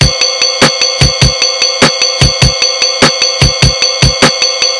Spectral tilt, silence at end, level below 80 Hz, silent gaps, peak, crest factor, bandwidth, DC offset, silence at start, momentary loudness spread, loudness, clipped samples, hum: -2.5 dB/octave; 0 s; -22 dBFS; none; 0 dBFS; 10 dB; 12 kHz; under 0.1%; 0 s; 1 LU; -7 LUFS; 2%; none